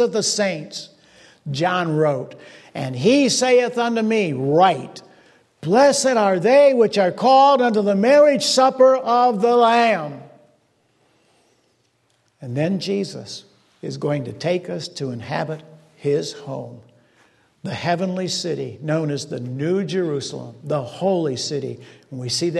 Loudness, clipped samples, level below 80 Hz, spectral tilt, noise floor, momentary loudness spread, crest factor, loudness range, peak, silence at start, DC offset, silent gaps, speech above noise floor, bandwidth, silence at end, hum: -19 LUFS; under 0.1%; -68 dBFS; -4.5 dB/octave; -64 dBFS; 19 LU; 18 dB; 12 LU; -2 dBFS; 0 s; under 0.1%; none; 45 dB; 12.5 kHz; 0 s; none